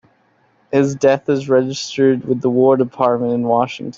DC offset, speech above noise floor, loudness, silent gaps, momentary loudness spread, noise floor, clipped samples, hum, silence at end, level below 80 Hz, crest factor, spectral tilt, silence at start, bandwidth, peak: under 0.1%; 42 dB; -16 LUFS; none; 4 LU; -58 dBFS; under 0.1%; none; 0.05 s; -60 dBFS; 14 dB; -6 dB/octave; 0.7 s; 7.6 kHz; -2 dBFS